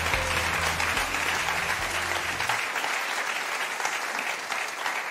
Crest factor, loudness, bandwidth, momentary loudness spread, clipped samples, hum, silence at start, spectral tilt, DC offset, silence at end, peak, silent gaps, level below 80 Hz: 18 dB; -27 LUFS; 16 kHz; 4 LU; under 0.1%; none; 0 s; -1.5 dB/octave; under 0.1%; 0 s; -12 dBFS; none; -46 dBFS